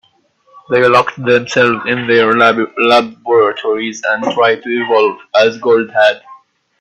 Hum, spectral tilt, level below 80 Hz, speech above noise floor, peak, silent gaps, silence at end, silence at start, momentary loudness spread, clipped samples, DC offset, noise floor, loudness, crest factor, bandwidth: none; -4.5 dB/octave; -58 dBFS; 42 dB; 0 dBFS; none; 0.45 s; 0.7 s; 7 LU; under 0.1%; under 0.1%; -54 dBFS; -12 LUFS; 12 dB; 8.6 kHz